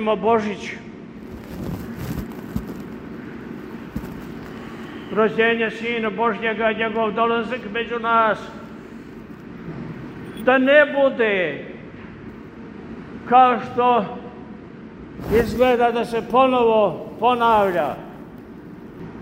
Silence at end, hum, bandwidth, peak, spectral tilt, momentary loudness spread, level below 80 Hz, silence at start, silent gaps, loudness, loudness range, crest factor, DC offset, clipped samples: 0 s; none; 16 kHz; -2 dBFS; -6 dB/octave; 22 LU; -46 dBFS; 0 s; none; -19 LUFS; 13 LU; 20 dB; under 0.1%; under 0.1%